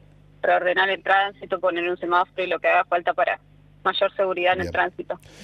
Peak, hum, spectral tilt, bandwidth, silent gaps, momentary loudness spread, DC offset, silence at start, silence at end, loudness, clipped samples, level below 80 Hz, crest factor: -6 dBFS; 50 Hz at -55 dBFS; -5 dB/octave; 9.2 kHz; none; 7 LU; under 0.1%; 0.45 s; 0 s; -22 LUFS; under 0.1%; -58 dBFS; 18 dB